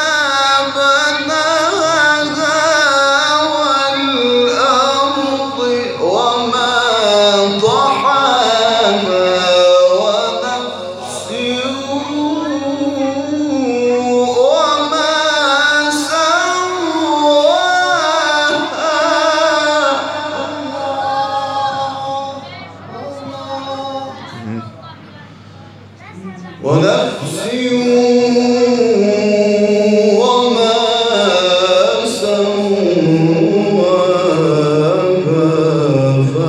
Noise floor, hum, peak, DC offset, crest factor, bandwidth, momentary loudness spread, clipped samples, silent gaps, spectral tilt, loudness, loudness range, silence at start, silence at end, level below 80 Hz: -36 dBFS; none; 0 dBFS; under 0.1%; 12 dB; 13.5 kHz; 11 LU; under 0.1%; none; -4 dB/octave; -13 LUFS; 9 LU; 0 s; 0 s; -64 dBFS